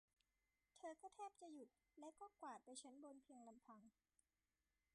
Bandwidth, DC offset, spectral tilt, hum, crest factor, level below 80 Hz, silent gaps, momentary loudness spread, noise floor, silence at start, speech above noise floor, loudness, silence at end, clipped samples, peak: 11 kHz; under 0.1%; -2.5 dB/octave; none; 18 dB; under -90 dBFS; none; 9 LU; under -90 dBFS; 0.75 s; over 28 dB; -61 LUFS; 1.05 s; under 0.1%; -46 dBFS